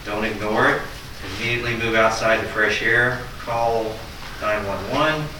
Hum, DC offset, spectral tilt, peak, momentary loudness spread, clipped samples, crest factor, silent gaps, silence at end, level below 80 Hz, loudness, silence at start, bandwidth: none; under 0.1%; -4.5 dB/octave; -6 dBFS; 12 LU; under 0.1%; 16 dB; none; 0 s; -40 dBFS; -21 LUFS; 0 s; 19 kHz